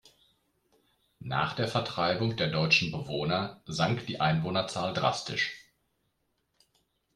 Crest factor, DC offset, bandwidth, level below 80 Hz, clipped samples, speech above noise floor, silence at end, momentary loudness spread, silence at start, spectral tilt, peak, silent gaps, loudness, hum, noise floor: 22 dB; under 0.1%; 12 kHz; -62 dBFS; under 0.1%; 47 dB; 1.55 s; 9 LU; 1.2 s; -5 dB/octave; -10 dBFS; none; -29 LUFS; none; -77 dBFS